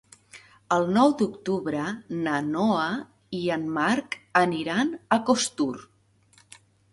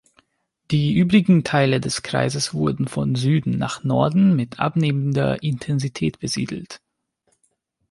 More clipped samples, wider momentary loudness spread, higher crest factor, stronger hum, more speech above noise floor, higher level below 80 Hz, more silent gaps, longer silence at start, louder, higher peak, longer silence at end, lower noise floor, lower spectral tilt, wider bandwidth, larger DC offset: neither; about the same, 9 LU vs 9 LU; about the same, 22 dB vs 18 dB; neither; second, 35 dB vs 49 dB; second, -66 dBFS vs -52 dBFS; neither; second, 0.35 s vs 0.7 s; second, -25 LUFS vs -20 LUFS; about the same, -4 dBFS vs -4 dBFS; about the same, 1.1 s vs 1.15 s; second, -60 dBFS vs -69 dBFS; second, -4.5 dB/octave vs -6 dB/octave; about the same, 11.5 kHz vs 11.5 kHz; neither